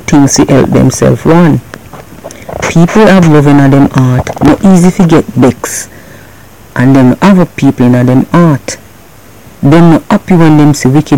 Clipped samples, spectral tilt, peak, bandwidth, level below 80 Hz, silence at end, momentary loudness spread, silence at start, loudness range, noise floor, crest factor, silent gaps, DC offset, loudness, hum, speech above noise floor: 8%; -6.5 dB/octave; 0 dBFS; 17.5 kHz; -30 dBFS; 0 s; 11 LU; 0 s; 2 LU; -35 dBFS; 6 dB; none; under 0.1%; -6 LUFS; none; 30 dB